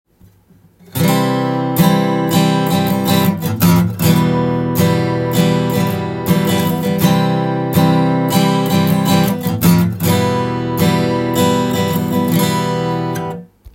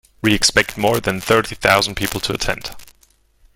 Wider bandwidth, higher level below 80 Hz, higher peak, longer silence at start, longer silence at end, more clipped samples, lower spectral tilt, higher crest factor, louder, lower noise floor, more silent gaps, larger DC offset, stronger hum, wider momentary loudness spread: about the same, 17 kHz vs 17 kHz; second, -46 dBFS vs -38 dBFS; about the same, 0 dBFS vs 0 dBFS; first, 0.95 s vs 0.25 s; second, 0.05 s vs 0.7 s; neither; first, -6 dB/octave vs -3 dB/octave; second, 14 dB vs 20 dB; about the same, -15 LUFS vs -17 LUFS; second, -49 dBFS vs -56 dBFS; neither; neither; neither; second, 5 LU vs 8 LU